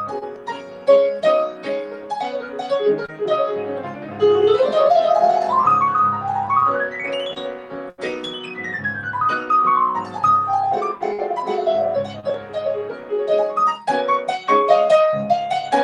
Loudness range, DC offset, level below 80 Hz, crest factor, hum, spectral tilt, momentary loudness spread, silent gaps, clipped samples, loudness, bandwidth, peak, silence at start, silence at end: 5 LU; under 0.1%; -64 dBFS; 18 dB; none; -5 dB/octave; 13 LU; none; under 0.1%; -19 LUFS; 10.5 kHz; -2 dBFS; 0 s; 0 s